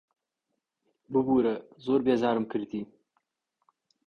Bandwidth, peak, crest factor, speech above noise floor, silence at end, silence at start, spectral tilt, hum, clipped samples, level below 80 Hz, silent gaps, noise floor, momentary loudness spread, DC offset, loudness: 6.8 kHz; -12 dBFS; 18 dB; 56 dB; 1.2 s; 1.1 s; -8 dB/octave; none; under 0.1%; -66 dBFS; none; -83 dBFS; 13 LU; under 0.1%; -28 LUFS